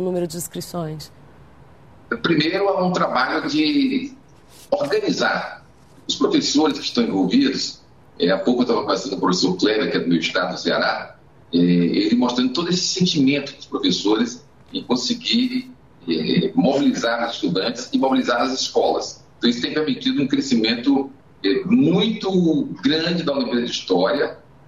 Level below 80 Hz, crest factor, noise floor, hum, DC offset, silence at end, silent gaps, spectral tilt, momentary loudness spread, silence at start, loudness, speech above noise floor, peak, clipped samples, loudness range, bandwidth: -58 dBFS; 16 dB; -47 dBFS; none; 0.2%; 0.3 s; none; -4.5 dB/octave; 9 LU; 0 s; -20 LUFS; 28 dB; -6 dBFS; under 0.1%; 2 LU; 14.5 kHz